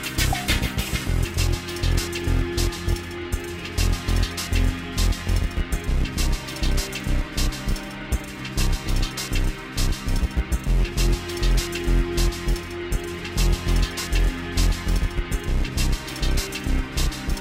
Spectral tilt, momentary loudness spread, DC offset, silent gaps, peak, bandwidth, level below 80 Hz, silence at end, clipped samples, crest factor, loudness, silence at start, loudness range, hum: -4.5 dB/octave; 5 LU; under 0.1%; none; -8 dBFS; 16 kHz; -24 dBFS; 0 s; under 0.1%; 16 dB; -26 LUFS; 0 s; 2 LU; none